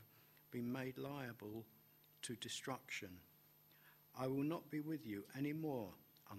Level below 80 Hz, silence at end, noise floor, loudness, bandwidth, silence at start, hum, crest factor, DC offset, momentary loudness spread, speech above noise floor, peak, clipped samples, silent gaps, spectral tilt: -82 dBFS; 0 s; -70 dBFS; -47 LUFS; 16 kHz; 0 s; none; 20 dB; under 0.1%; 23 LU; 23 dB; -30 dBFS; under 0.1%; none; -5 dB/octave